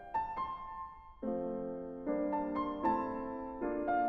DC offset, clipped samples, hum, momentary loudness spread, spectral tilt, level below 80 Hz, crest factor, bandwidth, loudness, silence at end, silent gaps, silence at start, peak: under 0.1%; under 0.1%; none; 10 LU; -9 dB/octave; -60 dBFS; 16 dB; 5.8 kHz; -38 LUFS; 0 s; none; 0 s; -20 dBFS